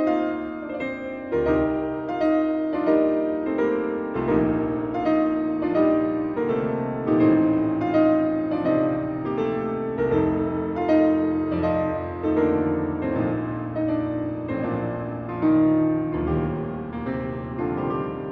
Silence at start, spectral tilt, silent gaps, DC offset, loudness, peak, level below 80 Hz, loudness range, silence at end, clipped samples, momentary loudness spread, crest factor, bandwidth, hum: 0 s; -10 dB/octave; none; under 0.1%; -24 LUFS; -8 dBFS; -46 dBFS; 3 LU; 0 s; under 0.1%; 9 LU; 16 dB; 4.8 kHz; none